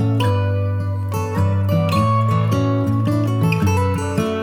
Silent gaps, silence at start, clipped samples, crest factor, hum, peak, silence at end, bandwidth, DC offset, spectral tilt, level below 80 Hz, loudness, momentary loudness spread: none; 0 s; under 0.1%; 12 dB; none; -4 dBFS; 0 s; 16 kHz; under 0.1%; -7.5 dB/octave; -44 dBFS; -19 LUFS; 5 LU